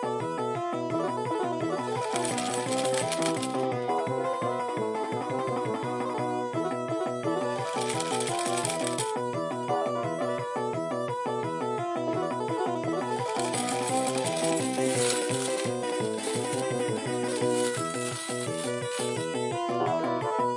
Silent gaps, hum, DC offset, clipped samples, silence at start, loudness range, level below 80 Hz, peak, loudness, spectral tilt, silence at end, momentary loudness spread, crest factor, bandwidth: none; none; under 0.1%; under 0.1%; 0 s; 3 LU; -76 dBFS; -12 dBFS; -29 LUFS; -4 dB/octave; 0 s; 4 LU; 16 dB; 11.5 kHz